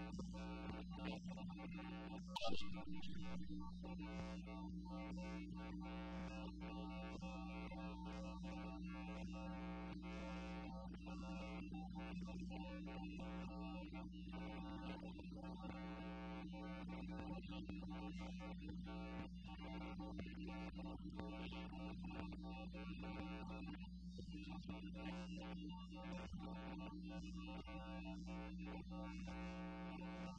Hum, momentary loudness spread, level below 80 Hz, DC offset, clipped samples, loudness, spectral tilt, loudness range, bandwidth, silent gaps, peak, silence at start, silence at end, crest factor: none; 2 LU; -58 dBFS; under 0.1%; under 0.1%; -52 LUFS; -6.5 dB/octave; 1 LU; 9.6 kHz; none; -32 dBFS; 0 s; 0 s; 20 dB